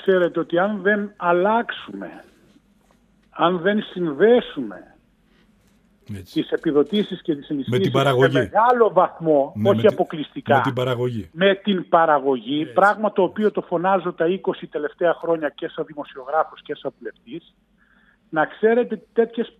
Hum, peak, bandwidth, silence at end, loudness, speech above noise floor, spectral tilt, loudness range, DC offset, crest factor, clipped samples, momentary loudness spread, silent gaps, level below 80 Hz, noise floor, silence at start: none; -4 dBFS; 14.5 kHz; 0.1 s; -20 LUFS; 38 dB; -7 dB/octave; 7 LU; under 0.1%; 18 dB; under 0.1%; 15 LU; none; -64 dBFS; -58 dBFS; 0 s